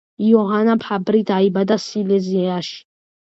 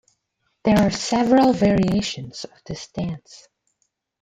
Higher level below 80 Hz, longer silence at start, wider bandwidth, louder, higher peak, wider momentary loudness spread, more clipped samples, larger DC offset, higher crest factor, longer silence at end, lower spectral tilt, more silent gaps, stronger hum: second, -64 dBFS vs -46 dBFS; second, 0.2 s vs 0.65 s; second, 7.8 kHz vs 14 kHz; about the same, -18 LUFS vs -20 LUFS; about the same, -2 dBFS vs -4 dBFS; second, 8 LU vs 18 LU; neither; neither; about the same, 16 dB vs 18 dB; second, 0.45 s vs 0.85 s; first, -7 dB/octave vs -5.5 dB/octave; neither; neither